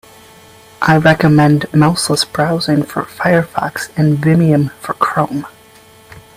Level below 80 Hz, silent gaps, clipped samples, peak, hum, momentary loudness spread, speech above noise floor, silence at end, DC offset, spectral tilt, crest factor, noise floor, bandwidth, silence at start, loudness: -46 dBFS; none; under 0.1%; 0 dBFS; none; 10 LU; 30 dB; 0.2 s; under 0.1%; -6 dB/octave; 14 dB; -43 dBFS; 15.5 kHz; 0.8 s; -13 LUFS